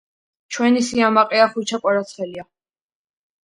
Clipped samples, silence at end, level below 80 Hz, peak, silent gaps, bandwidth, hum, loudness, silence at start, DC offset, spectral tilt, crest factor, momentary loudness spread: under 0.1%; 1 s; -64 dBFS; 0 dBFS; none; 11 kHz; none; -18 LUFS; 0.5 s; under 0.1%; -4 dB/octave; 20 dB; 15 LU